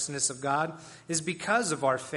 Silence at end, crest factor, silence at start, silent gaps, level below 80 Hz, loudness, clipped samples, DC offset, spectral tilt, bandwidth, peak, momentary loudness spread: 0 s; 18 dB; 0 s; none; -70 dBFS; -29 LUFS; under 0.1%; under 0.1%; -3 dB/octave; 11.5 kHz; -12 dBFS; 6 LU